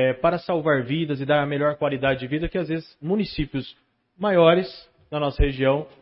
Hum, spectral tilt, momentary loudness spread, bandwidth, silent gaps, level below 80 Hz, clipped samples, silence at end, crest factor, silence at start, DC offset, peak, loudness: none; -11 dB/octave; 11 LU; 5.8 kHz; none; -36 dBFS; under 0.1%; 0.15 s; 18 dB; 0 s; under 0.1%; -4 dBFS; -23 LUFS